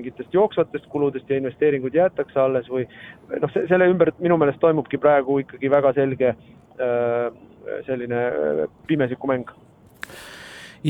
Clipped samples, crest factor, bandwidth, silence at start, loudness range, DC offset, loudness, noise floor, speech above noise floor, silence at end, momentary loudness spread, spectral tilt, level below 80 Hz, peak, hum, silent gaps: under 0.1%; 18 dB; 12 kHz; 0 s; 6 LU; under 0.1%; -21 LUFS; -41 dBFS; 20 dB; 0 s; 18 LU; -8 dB/octave; -60 dBFS; -4 dBFS; none; none